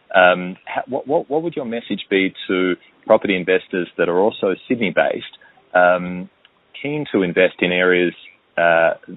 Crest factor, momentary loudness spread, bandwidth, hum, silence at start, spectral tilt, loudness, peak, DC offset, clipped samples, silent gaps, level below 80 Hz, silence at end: 18 dB; 12 LU; 4.1 kHz; none; 0.1 s; -3 dB/octave; -18 LUFS; 0 dBFS; under 0.1%; under 0.1%; none; -62 dBFS; 0 s